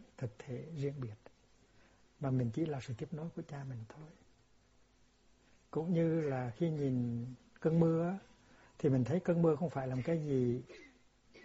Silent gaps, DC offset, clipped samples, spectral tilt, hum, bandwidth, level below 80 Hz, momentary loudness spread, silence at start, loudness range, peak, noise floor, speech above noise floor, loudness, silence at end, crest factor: none; under 0.1%; under 0.1%; -9 dB/octave; none; 7.6 kHz; -68 dBFS; 15 LU; 0 s; 7 LU; -18 dBFS; -68 dBFS; 33 dB; -36 LUFS; 0.05 s; 20 dB